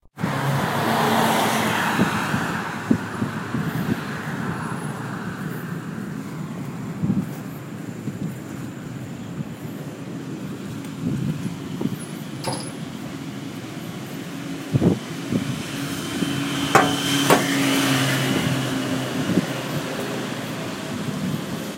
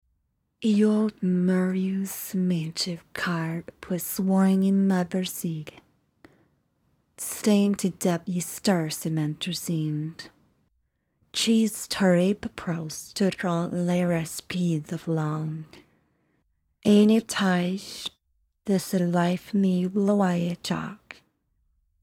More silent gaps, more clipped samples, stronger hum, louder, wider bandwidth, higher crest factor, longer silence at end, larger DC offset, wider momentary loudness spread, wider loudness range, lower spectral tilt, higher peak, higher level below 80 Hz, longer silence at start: neither; neither; neither; about the same, -25 LUFS vs -25 LUFS; about the same, 16 kHz vs 17 kHz; first, 24 dB vs 16 dB; second, 0 s vs 0.9 s; neither; about the same, 14 LU vs 12 LU; first, 10 LU vs 3 LU; about the same, -4.5 dB/octave vs -5.5 dB/octave; first, 0 dBFS vs -10 dBFS; first, -54 dBFS vs -64 dBFS; second, 0.15 s vs 0.6 s